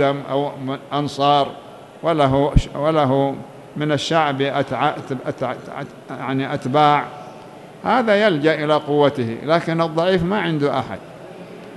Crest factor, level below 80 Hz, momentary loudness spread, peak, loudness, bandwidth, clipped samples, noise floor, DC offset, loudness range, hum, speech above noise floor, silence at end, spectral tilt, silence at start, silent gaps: 18 dB; -36 dBFS; 17 LU; -2 dBFS; -19 LUFS; 12 kHz; under 0.1%; -39 dBFS; under 0.1%; 4 LU; none; 20 dB; 0 s; -6.5 dB/octave; 0 s; none